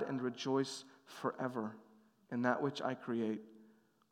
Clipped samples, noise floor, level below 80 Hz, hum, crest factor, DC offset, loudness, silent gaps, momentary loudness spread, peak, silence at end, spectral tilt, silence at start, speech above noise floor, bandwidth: under 0.1%; -67 dBFS; under -90 dBFS; none; 22 dB; under 0.1%; -39 LUFS; none; 11 LU; -18 dBFS; 0.45 s; -5.5 dB/octave; 0 s; 29 dB; 14.5 kHz